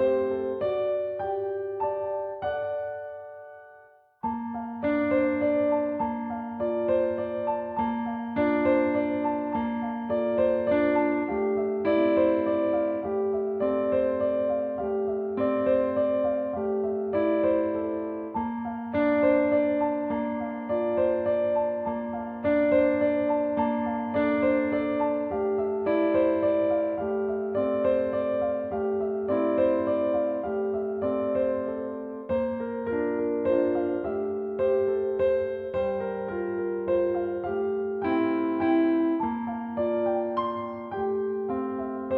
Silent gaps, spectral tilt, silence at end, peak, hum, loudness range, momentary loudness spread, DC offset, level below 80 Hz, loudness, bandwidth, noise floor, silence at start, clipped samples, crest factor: none; -10 dB/octave; 0 s; -10 dBFS; none; 3 LU; 8 LU; under 0.1%; -58 dBFS; -27 LUFS; 4.5 kHz; -55 dBFS; 0 s; under 0.1%; 16 dB